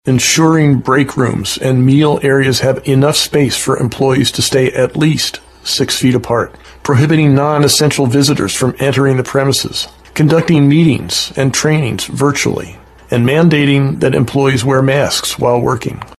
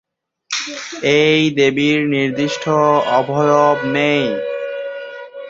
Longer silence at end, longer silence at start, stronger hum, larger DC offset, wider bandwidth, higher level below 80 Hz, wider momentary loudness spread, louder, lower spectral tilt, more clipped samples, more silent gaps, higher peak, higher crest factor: about the same, 0.05 s vs 0 s; second, 0.05 s vs 0.5 s; neither; neither; first, 13 kHz vs 7.8 kHz; first, -42 dBFS vs -60 dBFS; second, 7 LU vs 12 LU; first, -12 LUFS vs -16 LUFS; about the same, -5 dB/octave vs -5 dB/octave; neither; neither; about the same, 0 dBFS vs 0 dBFS; about the same, 12 dB vs 16 dB